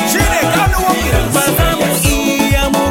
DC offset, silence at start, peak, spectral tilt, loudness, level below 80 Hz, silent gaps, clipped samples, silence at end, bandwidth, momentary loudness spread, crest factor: 0.2%; 0 s; 0 dBFS; -4 dB/octave; -13 LUFS; -20 dBFS; none; under 0.1%; 0 s; 17 kHz; 1 LU; 12 dB